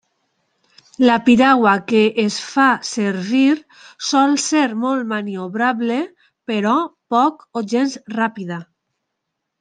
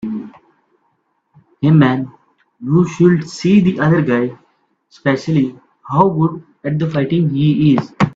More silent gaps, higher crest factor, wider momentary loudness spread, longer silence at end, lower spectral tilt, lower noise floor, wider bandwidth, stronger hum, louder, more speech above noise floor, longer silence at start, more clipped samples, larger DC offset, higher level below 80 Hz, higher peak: neither; about the same, 16 dB vs 16 dB; about the same, 12 LU vs 12 LU; first, 0.95 s vs 0.05 s; second, -4 dB/octave vs -8 dB/octave; first, -77 dBFS vs -65 dBFS; first, 9.6 kHz vs 7.8 kHz; neither; about the same, -17 LUFS vs -15 LUFS; first, 60 dB vs 51 dB; first, 1 s vs 0.05 s; neither; neither; second, -64 dBFS vs -52 dBFS; about the same, -2 dBFS vs 0 dBFS